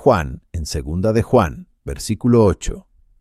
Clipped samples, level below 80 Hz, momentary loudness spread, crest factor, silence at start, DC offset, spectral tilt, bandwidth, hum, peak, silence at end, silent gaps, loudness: under 0.1%; -32 dBFS; 16 LU; 16 dB; 0 s; under 0.1%; -6.5 dB/octave; 14.5 kHz; none; -2 dBFS; 0.4 s; none; -18 LUFS